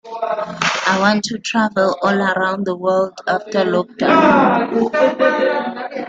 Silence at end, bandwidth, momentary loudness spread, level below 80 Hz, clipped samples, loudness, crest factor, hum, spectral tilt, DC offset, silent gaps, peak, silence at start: 0 s; 9 kHz; 8 LU; -56 dBFS; under 0.1%; -16 LUFS; 16 dB; none; -5 dB/octave; under 0.1%; none; -2 dBFS; 0.05 s